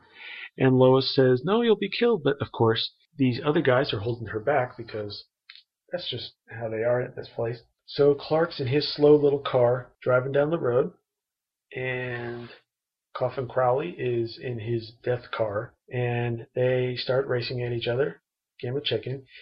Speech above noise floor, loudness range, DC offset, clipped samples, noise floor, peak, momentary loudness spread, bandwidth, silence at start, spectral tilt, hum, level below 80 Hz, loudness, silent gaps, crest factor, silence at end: 63 dB; 7 LU; under 0.1%; under 0.1%; -88 dBFS; -8 dBFS; 14 LU; 5.8 kHz; 0.15 s; -10 dB/octave; none; -62 dBFS; -25 LUFS; none; 18 dB; 0 s